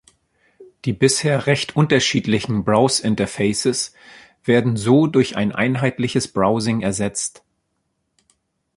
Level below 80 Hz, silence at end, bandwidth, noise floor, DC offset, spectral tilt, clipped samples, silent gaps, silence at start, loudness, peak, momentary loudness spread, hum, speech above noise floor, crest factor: -52 dBFS; 1.5 s; 11.5 kHz; -72 dBFS; under 0.1%; -5 dB/octave; under 0.1%; none; 0.6 s; -19 LUFS; -2 dBFS; 8 LU; none; 54 dB; 18 dB